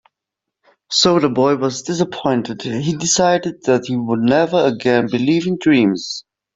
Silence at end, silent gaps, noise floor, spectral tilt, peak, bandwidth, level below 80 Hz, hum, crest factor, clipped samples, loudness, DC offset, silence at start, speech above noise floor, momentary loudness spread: 0.35 s; none; -82 dBFS; -4.5 dB/octave; -2 dBFS; 8 kHz; -54 dBFS; none; 14 dB; under 0.1%; -16 LUFS; under 0.1%; 0.9 s; 66 dB; 7 LU